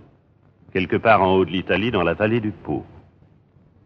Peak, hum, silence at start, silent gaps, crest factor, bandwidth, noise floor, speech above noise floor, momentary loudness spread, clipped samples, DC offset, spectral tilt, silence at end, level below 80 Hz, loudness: -2 dBFS; none; 0.75 s; none; 20 dB; 6 kHz; -56 dBFS; 36 dB; 13 LU; under 0.1%; under 0.1%; -8.5 dB/octave; 0.85 s; -52 dBFS; -20 LUFS